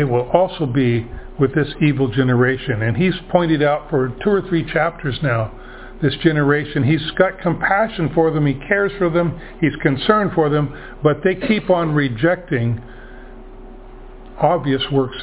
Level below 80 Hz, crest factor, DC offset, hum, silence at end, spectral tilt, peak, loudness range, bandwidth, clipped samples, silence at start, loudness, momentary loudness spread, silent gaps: -40 dBFS; 18 dB; under 0.1%; none; 0 s; -11 dB/octave; 0 dBFS; 2 LU; 4 kHz; under 0.1%; 0 s; -18 LUFS; 5 LU; none